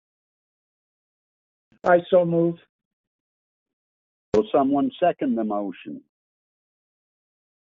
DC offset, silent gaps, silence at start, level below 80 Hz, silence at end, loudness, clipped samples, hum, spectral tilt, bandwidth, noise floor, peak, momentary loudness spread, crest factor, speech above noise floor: under 0.1%; 2.69-2.79 s, 2.85-3.66 s, 3.73-4.32 s; 1.85 s; -64 dBFS; 1.65 s; -22 LUFS; under 0.1%; none; -6 dB/octave; 4.6 kHz; under -90 dBFS; -6 dBFS; 20 LU; 20 dB; over 69 dB